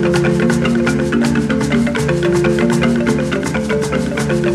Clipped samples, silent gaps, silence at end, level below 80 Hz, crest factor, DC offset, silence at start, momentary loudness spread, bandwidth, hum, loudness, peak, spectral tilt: under 0.1%; none; 0 s; -34 dBFS; 14 dB; under 0.1%; 0 s; 4 LU; 13.5 kHz; none; -15 LUFS; -2 dBFS; -6 dB/octave